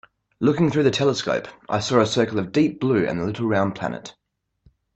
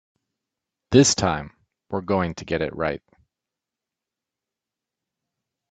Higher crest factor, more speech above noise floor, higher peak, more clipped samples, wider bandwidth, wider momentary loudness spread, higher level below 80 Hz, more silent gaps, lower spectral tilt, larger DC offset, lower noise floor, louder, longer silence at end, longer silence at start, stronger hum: about the same, 20 dB vs 24 dB; second, 39 dB vs 66 dB; about the same, -2 dBFS vs -2 dBFS; neither; about the same, 8.6 kHz vs 9.4 kHz; second, 9 LU vs 15 LU; about the same, -56 dBFS vs -52 dBFS; neither; first, -6 dB/octave vs -4.5 dB/octave; neither; second, -60 dBFS vs -87 dBFS; about the same, -22 LUFS vs -22 LUFS; second, 0.85 s vs 2.75 s; second, 0.4 s vs 0.9 s; neither